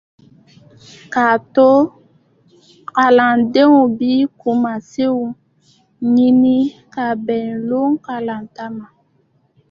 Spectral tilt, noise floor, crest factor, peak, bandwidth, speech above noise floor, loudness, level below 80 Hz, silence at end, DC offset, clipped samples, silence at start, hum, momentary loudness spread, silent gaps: -6.5 dB/octave; -59 dBFS; 16 dB; 0 dBFS; 7 kHz; 45 dB; -15 LUFS; -60 dBFS; 0.85 s; under 0.1%; under 0.1%; 1.1 s; none; 16 LU; none